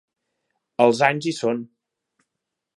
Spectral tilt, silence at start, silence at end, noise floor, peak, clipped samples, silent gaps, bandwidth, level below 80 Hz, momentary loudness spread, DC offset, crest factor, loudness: -5 dB/octave; 0.8 s; 1.1 s; -82 dBFS; -2 dBFS; under 0.1%; none; 11.5 kHz; -74 dBFS; 13 LU; under 0.1%; 24 dB; -21 LUFS